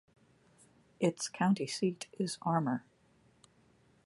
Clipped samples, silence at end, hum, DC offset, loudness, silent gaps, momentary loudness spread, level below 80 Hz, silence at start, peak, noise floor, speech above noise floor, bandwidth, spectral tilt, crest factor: under 0.1%; 1.25 s; none; under 0.1%; -34 LUFS; none; 7 LU; -78 dBFS; 1 s; -16 dBFS; -68 dBFS; 35 dB; 11.5 kHz; -5.5 dB/octave; 20 dB